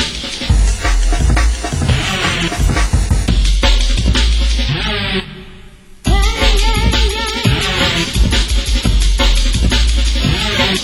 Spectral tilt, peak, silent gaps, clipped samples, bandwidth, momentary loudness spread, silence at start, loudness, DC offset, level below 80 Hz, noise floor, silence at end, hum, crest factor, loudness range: -4 dB/octave; 0 dBFS; none; under 0.1%; 16 kHz; 4 LU; 0 s; -15 LUFS; under 0.1%; -14 dBFS; -36 dBFS; 0 s; none; 12 dB; 2 LU